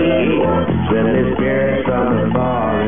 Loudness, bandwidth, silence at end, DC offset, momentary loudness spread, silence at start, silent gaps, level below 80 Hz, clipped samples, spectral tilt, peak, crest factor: -16 LUFS; 3.7 kHz; 0 s; 2%; 2 LU; 0 s; none; -34 dBFS; under 0.1%; -12.5 dB/octave; -2 dBFS; 12 dB